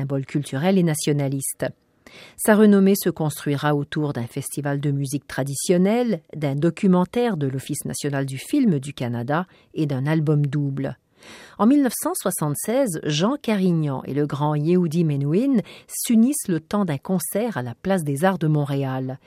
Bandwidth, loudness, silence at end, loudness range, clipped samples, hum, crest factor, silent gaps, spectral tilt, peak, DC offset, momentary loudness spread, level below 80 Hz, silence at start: 16 kHz; -22 LUFS; 0.1 s; 3 LU; under 0.1%; none; 18 dB; none; -6 dB/octave; -4 dBFS; under 0.1%; 9 LU; -62 dBFS; 0 s